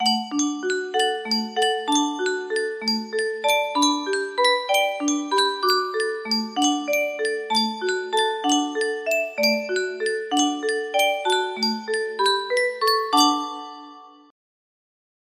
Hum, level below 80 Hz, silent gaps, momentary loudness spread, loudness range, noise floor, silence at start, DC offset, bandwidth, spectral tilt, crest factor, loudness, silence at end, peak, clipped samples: none; -72 dBFS; none; 6 LU; 2 LU; -44 dBFS; 0 s; under 0.1%; 15.5 kHz; -1.5 dB/octave; 18 dB; -22 LUFS; 1.2 s; -4 dBFS; under 0.1%